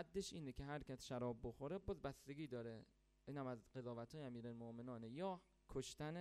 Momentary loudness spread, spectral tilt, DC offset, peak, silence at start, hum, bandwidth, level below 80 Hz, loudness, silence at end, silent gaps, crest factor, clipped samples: 6 LU; -6 dB/octave; under 0.1%; -34 dBFS; 0 s; none; 13 kHz; -68 dBFS; -52 LUFS; 0 s; none; 18 dB; under 0.1%